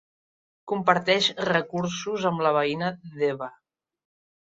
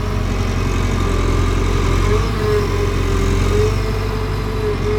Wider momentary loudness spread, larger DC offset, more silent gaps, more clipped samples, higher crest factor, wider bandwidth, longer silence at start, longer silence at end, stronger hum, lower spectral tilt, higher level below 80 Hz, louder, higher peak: first, 10 LU vs 4 LU; neither; neither; neither; first, 22 dB vs 14 dB; second, 7.8 kHz vs 15 kHz; first, 0.65 s vs 0 s; first, 0.9 s vs 0 s; neither; second, -4.5 dB/octave vs -6 dB/octave; second, -68 dBFS vs -20 dBFS; second, -25 LUFS vs -18 LUFS; about the same, -4 dBFS vs -2 dBFS